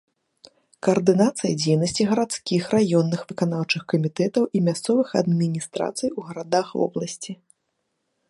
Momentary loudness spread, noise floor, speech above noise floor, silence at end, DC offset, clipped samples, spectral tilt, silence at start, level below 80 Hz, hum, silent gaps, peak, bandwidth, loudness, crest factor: 9 LU; -75 dBFS; 53 dB; 0.95 s; under 0.1%; under 0.1%; -5.5 dB/octave; 0.85 s; -64 dBFS; none; none; -4 dBFS; 11.5 kHz; -23 LUFS; 18 dB